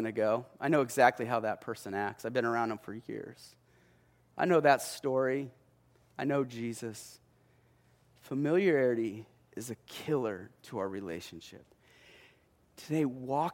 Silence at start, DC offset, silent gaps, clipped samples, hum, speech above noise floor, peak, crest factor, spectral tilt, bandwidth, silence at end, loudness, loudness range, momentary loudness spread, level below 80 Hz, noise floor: 0 s; under 0.1%; none; under 0.1%; none; 34 dB; -8 dBFS; 24 dB; -5.5 dB/octave; 16.5 kHz; 0 s; -32 LUFS; 7 LU; 20 LU; -76 dBFS; -66 dBFS